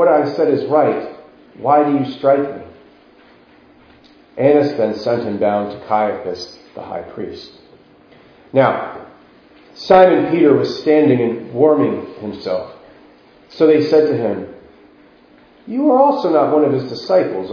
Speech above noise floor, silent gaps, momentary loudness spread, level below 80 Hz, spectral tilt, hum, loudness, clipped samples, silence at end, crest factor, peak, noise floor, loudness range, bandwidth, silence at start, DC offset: 33 dB; none; 17 LU; -58 dBFS; -7.5 dB/octave; none; -15 LUFS; under 0.1%; 0 s; 16 dB; 0 dBFS; -48 dBFS; 8 LU; 5.4 kHz; 0 s; under 0.1%